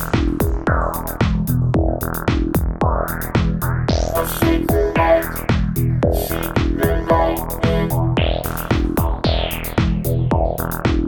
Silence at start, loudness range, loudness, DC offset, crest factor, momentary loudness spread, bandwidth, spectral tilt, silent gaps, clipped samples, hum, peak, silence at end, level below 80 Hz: 0 s; 2 LU; -19 LUFS; under 0.1%; 16 dB; 4 LU; over 20 kHz; -6.5 dB/octave; none; under 0.1%; none; -2 dBFS; 0 s; -24 dBFS